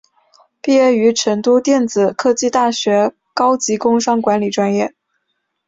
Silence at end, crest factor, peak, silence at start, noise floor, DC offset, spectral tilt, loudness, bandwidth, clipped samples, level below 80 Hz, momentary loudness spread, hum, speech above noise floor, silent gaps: 0.8 s; 14 dB; -2 dBFS; 0.65 s; -71 dBFS; under 0.1%; -4 dB/octave; -15 LUFS; 7.8 kHz; under 0.1%; -60 dBFS; 5 LU; none; 57 dB; none